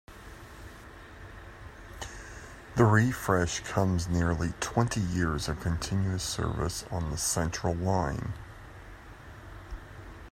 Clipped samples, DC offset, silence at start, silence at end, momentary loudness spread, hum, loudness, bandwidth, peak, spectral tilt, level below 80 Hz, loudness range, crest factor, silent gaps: under 0.1%; under 0.1%; 0.1 s; 0 s; 21 LU; none; -29 LUFS; 16 kHz; -8 dBFS; -5 dB/octave; -46 dBFS; 5 LU; 22 dB; none